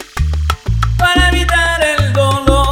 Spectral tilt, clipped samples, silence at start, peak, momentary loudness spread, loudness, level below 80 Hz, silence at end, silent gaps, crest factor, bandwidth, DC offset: -4.5 dB/octave; under 0.1%; 0 s; 0 dBFS; 7 LU; -13 LUFS; -18 dBFS; 0 s; none; 12 dB; 16.5 kHz; under 0.1%